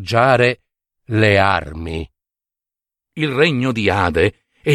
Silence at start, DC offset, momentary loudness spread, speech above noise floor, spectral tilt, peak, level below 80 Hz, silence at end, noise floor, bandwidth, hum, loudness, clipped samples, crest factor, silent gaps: 0 s; under 0.1%; 15 LU; 72 dB; -6 dB/octave; -2 dBFS; -40 dBFS; 0 s; -88 dBFS; 12.5 kHz; none; -16 LUFS; under 0.1%; 16 dB; none